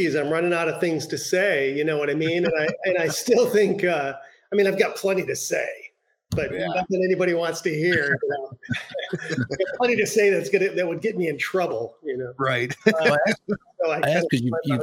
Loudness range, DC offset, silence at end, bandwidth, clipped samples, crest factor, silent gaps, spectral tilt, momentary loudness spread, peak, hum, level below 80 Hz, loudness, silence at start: 2 LU; under 0.1%; 0 s; 17 kHz; under 0.1%; 22 dB; none; -5 dB/octave; 10 LU; -2 dBFS; none; -60 dBFS; -23 LUFS; 0 s